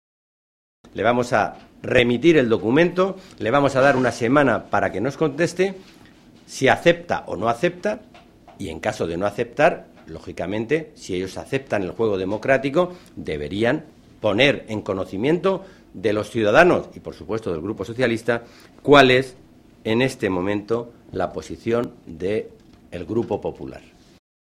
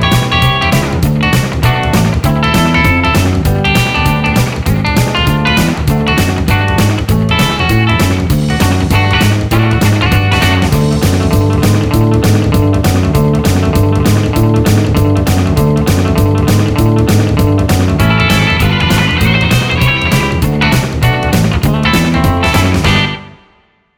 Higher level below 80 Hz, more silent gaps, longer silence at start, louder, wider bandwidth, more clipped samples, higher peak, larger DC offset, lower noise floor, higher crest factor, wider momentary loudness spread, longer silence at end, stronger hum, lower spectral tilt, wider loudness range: second, -50 dBFS vs -22 dBFS; neither; first, 0.95 s vs 0 s; second, -21 LUFS vs -11 LUFS; second, 13.5 kHz vs over 20 kHz; neither; about the same, 0 dBFS vs 0 dBFS; neither; second, -47 dBFS vs -51 dBFS; first, 22 dB vs 10 dB; first, 16 LU vs 2 LU; about the same, 0.8 s vs 0.7 s; neither; about the same, -5.5 dB/octave vs -5.5 dB/octave; first, 6 LU vs 1 LU